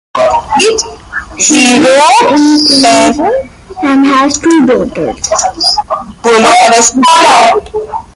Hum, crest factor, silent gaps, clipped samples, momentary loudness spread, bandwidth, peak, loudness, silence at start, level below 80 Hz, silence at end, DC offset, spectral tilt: none; 8 dB; none; 0.2%; 11 LU; 16 kHz; 0 dBFS; -7 LUFS; 0.15 s; -38 dBFS; 0.15 s; under 0.1%; -2 dB/octave